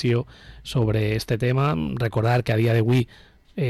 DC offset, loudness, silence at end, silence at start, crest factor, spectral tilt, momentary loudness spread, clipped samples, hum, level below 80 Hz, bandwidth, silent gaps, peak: under 0.1%; -22 LUFS; 0 s; 0 s; 10 dB; -7.5 dB/octave; 12 LU; under 0.1%; none; -46 dBFS; 13 kHz; none; -12 dBFS